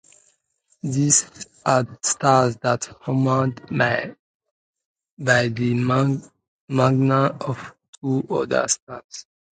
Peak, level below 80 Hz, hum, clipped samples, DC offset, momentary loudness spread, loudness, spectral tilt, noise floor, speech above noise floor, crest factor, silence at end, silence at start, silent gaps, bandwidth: -2 dBFS; -60 dBFS; none; under 0.1%; under 0.1%; 15 LU; -21 LUFS; -4.5 dB/octave; -67 dBFS; 46 dB; 20 dB; 0.3 s; 0.85 s; 4.19-4.40 s, 4.51-4.74 s, 4.85-4.96 s, 5.11-5.17 s, 6.48-6.67 s, 7.88-7.93 s, 8.82-8.87 s, 9.04-9.09 s; 9.6 kHz